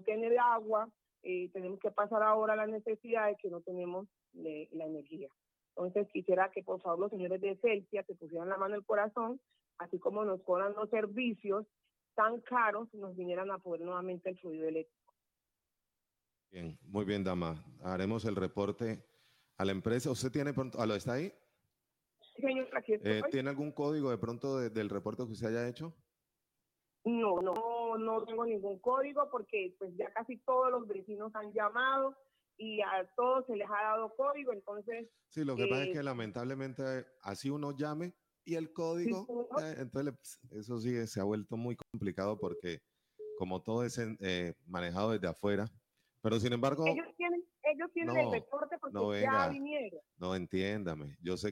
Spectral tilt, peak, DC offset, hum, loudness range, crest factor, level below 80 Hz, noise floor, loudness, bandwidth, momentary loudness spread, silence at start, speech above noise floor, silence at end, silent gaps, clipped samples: -6 dB/octave; -16 dBFS; under 0.1%; none; 5 LU; 20 dB; -72 dBFS; -89 dBFS; -36 LUFS; 15.5 kHz; 11 LU; 0 s; 53 dB; 0 s; none; under 0.1%